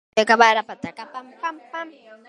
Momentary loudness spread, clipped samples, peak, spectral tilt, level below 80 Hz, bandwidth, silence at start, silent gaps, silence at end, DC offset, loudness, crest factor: 22 LU; under 0.1%; 0 dBFS; -2.5 dB/octave; -68 dBFS; 11.5 kHz; 0.15 s; none; 0.15 s; under 0.1%; -18 LUFS; 22 dB